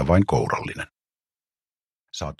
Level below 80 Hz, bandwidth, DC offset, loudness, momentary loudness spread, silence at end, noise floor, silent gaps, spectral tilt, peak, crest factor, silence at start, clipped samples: -42 dBFS; 12 kHz; under 0.1%; -23 LUFS; 18 LU; 0.05 s; under -90 dBFS; 1.85-2.05 s; -6.5 dB/octave; -6 dBFS; 20 dB; 0 s; under 0.1%